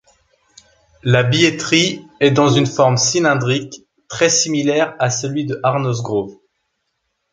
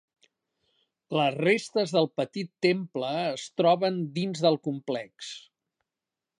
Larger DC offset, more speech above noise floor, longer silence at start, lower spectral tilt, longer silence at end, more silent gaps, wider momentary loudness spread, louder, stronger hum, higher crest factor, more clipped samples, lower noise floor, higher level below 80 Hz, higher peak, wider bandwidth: neither; second, 56 dB vs 62 dB; about the same, 1.05 s vs 1.1 s; second, -4 dB/octave vs -5.5 dB/octave; about the same, 1 s vs 1 s; neither; about the same, 9 LU vs 10 LU; first, -16 LUFS vs -27 LUFS; neither; about the same, 16 dB vs 20 dB; neither; second, -71 dBFS vs -89 dBFS; first, -54 dBFS vs -80 dBFS; first, 0 dBFS vs -8 dBFS; second, 9.6 kHz vs 11 kHz